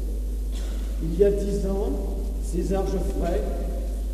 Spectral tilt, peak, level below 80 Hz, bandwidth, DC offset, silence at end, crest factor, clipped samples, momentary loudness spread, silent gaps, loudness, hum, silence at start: -7.5 dB/octave; -8 dBFS; -26 dBFS; 14 kHz; under 0.1%; 0 s; 18 dB; under 0.1%; 9 LU; none; -27 LUFS; none; 0 s